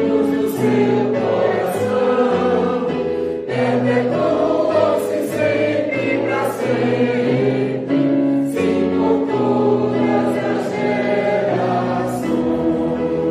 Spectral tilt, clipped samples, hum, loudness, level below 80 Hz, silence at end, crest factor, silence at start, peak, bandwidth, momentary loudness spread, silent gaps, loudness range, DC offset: -7 dB/octave; under 0.1%; none; -18 LUFS; -52 dBFS; 0 s; 12 dB; 0 s; -4 dBFS; 15 kHz; 4 LU; none; 1 LU; under 0.1%